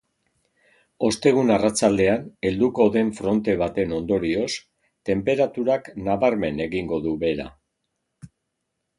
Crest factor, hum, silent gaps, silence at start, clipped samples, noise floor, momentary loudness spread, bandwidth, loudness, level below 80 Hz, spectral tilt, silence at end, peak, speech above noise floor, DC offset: 18 dB; none; none; 1 s; under 0.1%; -78 dBFS; 8 LU; 11.5 kHz; -22 LUFS; -50 dBFS; -5.5 dB/octave; 0.7 s; -4 dBFS; 57 dB; under 0.1%